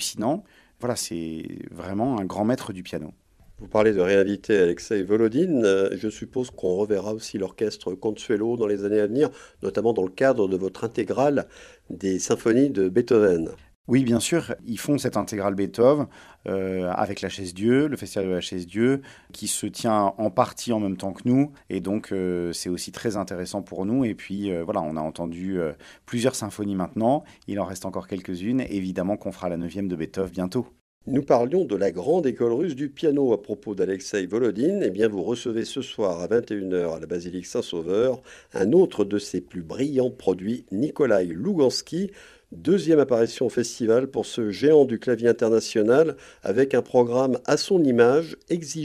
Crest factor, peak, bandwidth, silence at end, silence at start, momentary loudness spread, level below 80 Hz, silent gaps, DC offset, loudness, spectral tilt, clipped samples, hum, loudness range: 20 dB; -4 dBFS; 14.5 kHz; 0 s; 0 s; 11 LU; -58 dBFS; 13.75-13.84 s, 30.81-31.01 s; under 0.1%; -24 LUFS; -5.5 dB/octave; under 0.1%; none; 6 LU